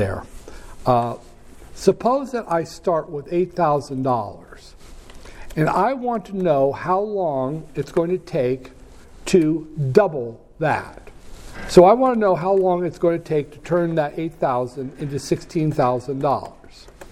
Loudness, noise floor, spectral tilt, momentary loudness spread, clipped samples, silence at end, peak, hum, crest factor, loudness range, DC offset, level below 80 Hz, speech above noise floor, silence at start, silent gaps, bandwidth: -21 LUFS; -42 dBFS; -7 dB/octave; 11 LU; under 0.1%; 0 s; 0 dBFS; none; 20 dB; 5 LU; under 0.1%; -44 dBFS; 22 dB; 0 s; none; 14.5 kHz